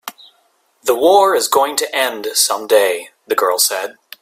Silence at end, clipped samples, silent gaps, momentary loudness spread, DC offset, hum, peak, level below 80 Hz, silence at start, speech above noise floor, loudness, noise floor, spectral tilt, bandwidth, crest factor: 0.3 s; under 0.1%; none; 12 LU; under 0.1%; none; 0 dBFS; -64 dBFS; 0.05 s; 44 dB; -15 LUFS; -59 dBFS; 0 dB/octave; 16.5 kHz; 16 dB